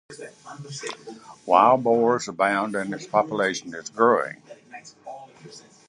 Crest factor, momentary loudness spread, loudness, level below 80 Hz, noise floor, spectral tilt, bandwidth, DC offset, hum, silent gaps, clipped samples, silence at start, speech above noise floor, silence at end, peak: 22 dB; 24 LU; -22 LUFS; -72 dBFS; -47 dBFS; -4.5 dB/octave; 11.5 kHz; under 0.1%; none; none; under 0.1%; 0.1 s; 24 dB; 0.3 s; -2 dBFS